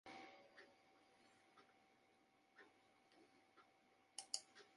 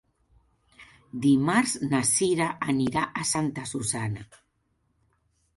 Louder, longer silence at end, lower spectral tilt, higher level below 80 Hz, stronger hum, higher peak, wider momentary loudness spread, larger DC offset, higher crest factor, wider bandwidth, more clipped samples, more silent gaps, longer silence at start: second, -54 LUFS vs -25 LUFS; second, 0 s vs 1.3 s; second, 0.5 dB/octave vs -4 dB/octave; second, under -90 dBFS vs -60 dBFS; neither; second, -24 dBFS vs -10 dBFS; first, 20 LU vs 9 LU; neither; first, 40 dB vs 18 dB; about the same, 11 kHz vs 12 kHz; neither; neither; second, 0.05 s vs 0.8 s